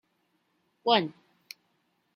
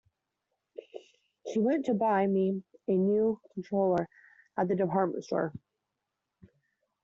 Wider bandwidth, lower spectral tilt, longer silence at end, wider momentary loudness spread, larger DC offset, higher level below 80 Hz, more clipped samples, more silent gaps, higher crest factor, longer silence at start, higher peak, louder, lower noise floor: first, 16 kHz vs 7.4 kHz; second, -5 dB/octave vs -7.5 dB/octave; second, 1.05 s vs 1.45 s; first, 23 LU vs 20 LU; neither; second, -82 dBFS vs -72 dBFS; neither; neither; first, 26 dB vs 16 dB; about the same, 0.85 s vs 0.95 s; first, -8 dBFS vs -14 dBFS; first, -27 LUFS vs -30 LUFS; second, -74 dBFS vs -86 dBFS